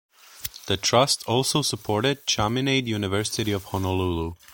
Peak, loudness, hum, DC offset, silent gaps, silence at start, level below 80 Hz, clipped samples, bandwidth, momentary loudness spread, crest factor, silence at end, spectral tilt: -4 dBFS; -24 LUFS; none; under 0.1%; none; 0.35 s; -48 dBFS; under 0.1%; 17 kHz; 8 LU; 20 dB; 0 s; -4 dB/octave